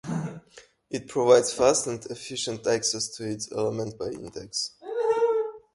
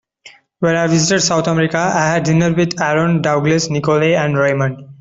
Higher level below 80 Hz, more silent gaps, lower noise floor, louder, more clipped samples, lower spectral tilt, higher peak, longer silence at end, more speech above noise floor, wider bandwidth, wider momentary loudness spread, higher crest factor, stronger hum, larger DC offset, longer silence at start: second, -62 dBFS vs -50 dBFS; neither; first, -54 dBFS vs -45 dBFS; second, -26 LUFS vs -15 LUFS; neither; second, -3.5 dB/octave vs -5 dB/octave; second, -6 dBFS vs 0 dBFS; about the same, 0.15 s vs 0.05 s; about the same, 28 dB vs 30 dB; first, 11.5 kHz vs 7.8 kHz; first, 15 LU vs 3 LU; first, 22 dB vs 14 dB; neither; neither; second, 0.05 s vs 0.25 s